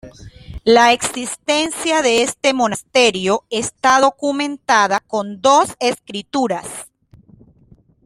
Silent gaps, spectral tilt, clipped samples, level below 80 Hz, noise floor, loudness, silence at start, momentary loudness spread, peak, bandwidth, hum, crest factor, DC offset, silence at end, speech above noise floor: none; -2.5 dB/octave; under 0.1%; -48 dBFS; -51 dBFS; -16 LUFS; 0.05 s; 10 LU; 0 dBFS; 15.5 kHz; none; 16 dB; under 0.1%; 1.2 s; 34 dB